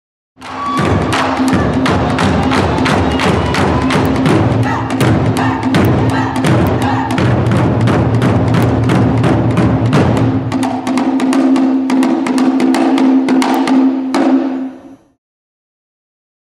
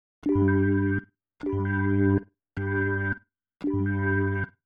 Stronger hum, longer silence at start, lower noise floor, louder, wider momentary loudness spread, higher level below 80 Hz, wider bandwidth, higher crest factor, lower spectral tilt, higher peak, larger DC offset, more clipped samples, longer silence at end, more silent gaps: neither; first, 0.4 s vs 0.25 s; second, -34 dBFS vs -52 dBFS; first, -12 LUFS vs -27 LUFS; second, 3 LU vs 11 LU; first, -32 dBFS vs -54 dBFS; first, 15.5 kHz vs 3.7 kHz; about the same, 12 dB vs 14 dB; second, -7 dB/octave vs -11 dB/octave; first, 0 dBFS vs -12 dBFS; neither; neither; first, 1.6 s vs 0.2 s; neither